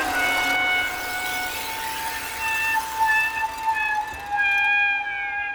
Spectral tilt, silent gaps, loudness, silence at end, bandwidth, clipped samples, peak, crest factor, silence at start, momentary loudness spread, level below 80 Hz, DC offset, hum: -1 dB/octave; none; -22 LUFS; 0 s; over 20 kHz; under 0.1%; -10 dBFS; 14 dB; 0 s; 8 LU; -52 dBFS; under 0.1%; none